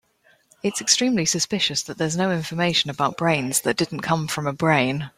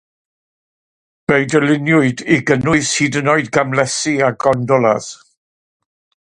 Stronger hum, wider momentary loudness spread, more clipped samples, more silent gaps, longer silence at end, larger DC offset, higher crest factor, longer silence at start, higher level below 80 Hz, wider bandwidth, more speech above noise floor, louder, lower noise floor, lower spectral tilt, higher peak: neither; first, 6 LU vs 3 LU; neither; neither; second, 0.1 s vs 1.15 s; neither; about the same, 20 dB vs 16 dB; second, 0.65 s vs 1.3 s; second, -58 dBFS vs -52 dBFS; first, 16 kHz vs 11.5 kHz; second, 38 dB vs over 75 dB; second, -21 LUFS vs -15 LUFS; second, -60 dBFS vs under -90 dBFS; second, -3.5 dB/octave vs -5 dB/octave; second, -4 dBFS vs 0 dBFS